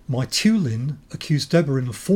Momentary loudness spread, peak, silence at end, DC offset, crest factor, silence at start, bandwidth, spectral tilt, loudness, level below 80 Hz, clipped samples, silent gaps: 10 LU; -6 dBFS; 0 s; under 0.1%; 16 dB; 0.1 s; 17 kHz; -5.5 dB/octave; -21 LUFS; -52 dBFS; under 0.1%; none